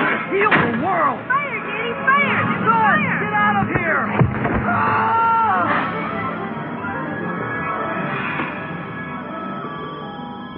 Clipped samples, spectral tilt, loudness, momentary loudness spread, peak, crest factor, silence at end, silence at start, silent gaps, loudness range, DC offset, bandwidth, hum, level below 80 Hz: under 0.1%; -4.5 dB/octave; -19 LUFS; 13 LU; -2 dBFS; 18 dB; 0 s; 0 s; none; 8 LU; under 0.1%; 5.2 kHz; none; -46 dBFS